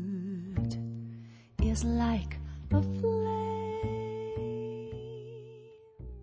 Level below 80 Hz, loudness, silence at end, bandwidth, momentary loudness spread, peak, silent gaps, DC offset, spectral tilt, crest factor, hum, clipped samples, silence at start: -40 dBFS; -34 LUFS; 0 s; 8 kHz; 18 LU; -16 dBFS; none; under 0.1%; -7.5 dB/octave; 18 dB; none; under 0.1%; 0 s